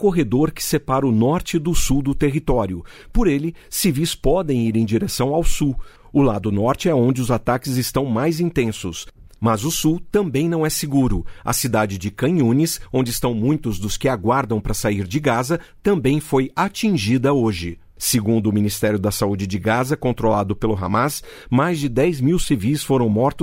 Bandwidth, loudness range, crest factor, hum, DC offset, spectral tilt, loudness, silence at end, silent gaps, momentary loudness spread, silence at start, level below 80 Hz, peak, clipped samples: 16.5 kHz; 1 LU; 14 dB; none; under 0.1%; -5.5 dB/octave; -20 LUFS; 0 s; none; 5 LU; 0 s; -32 dBFS; -4 dBFS; under 0.1%